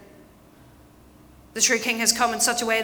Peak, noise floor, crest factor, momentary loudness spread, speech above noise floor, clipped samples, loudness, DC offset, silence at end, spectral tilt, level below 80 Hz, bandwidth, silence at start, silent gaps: -4 dBFS; -51 dBFS; 22 dB; 2 LU; 29 dB; under 0.1%; -20 LUFS; under 0.1%; 0 s; -0.5 dB/octave; -58 dBFS; over 20 kHz; 1.55 s; none